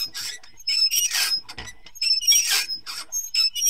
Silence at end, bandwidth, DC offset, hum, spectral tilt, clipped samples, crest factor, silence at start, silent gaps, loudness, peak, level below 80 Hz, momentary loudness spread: 0 s; 16 kHz; 0.7%; none; 3.5 dB/octave; under 0.1%; 18 dB; 0 s; none; -20 LUFS; -6 dBFS; -58 dBFS; 16 LU